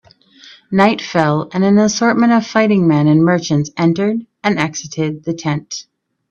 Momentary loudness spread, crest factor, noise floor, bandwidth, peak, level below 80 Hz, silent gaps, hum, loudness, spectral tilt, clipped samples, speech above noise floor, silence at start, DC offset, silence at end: 9 LU; 14 dB; -44 dBFS; 7.8 kHz; 0 dBFS; -54 dBFS; none; none; -15 LUFS; -6 dB/octave; under 0.1%; 30 dB; 0.7 s; under 0.1%; 0.5 s